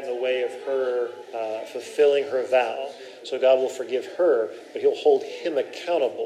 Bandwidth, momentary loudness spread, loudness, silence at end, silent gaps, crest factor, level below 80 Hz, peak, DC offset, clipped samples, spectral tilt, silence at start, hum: 12 kHz; 11 LU; -24 LUFS; 0 s; none; 16 dB; under -90 dBFS; -6 dBFS; under 0.1%; under 0.1%; -3.5 dB/octave; 0 s; none